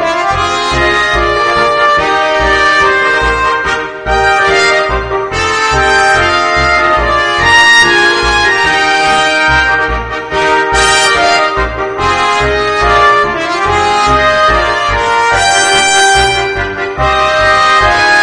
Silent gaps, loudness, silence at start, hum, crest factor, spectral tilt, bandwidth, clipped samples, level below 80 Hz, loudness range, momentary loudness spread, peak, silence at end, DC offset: none; -8 LUFS; 0 s; none; 10 dB; -2.5 dB/octave; 11 kHz; 0.2%; -26 dBFS; 3 LU; 6 LU; 0 dBFS; 0 s; under 0.1%